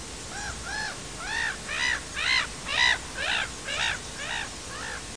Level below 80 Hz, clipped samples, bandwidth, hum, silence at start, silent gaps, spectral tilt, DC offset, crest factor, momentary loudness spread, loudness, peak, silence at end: -48 dBFS; under 0.1%; 10.5 kHz; none; 0 s; none; -1 dB/octave; 0.2%; 20 dB; 12 LU; -28 LUFS; -12 dBFS; 0 s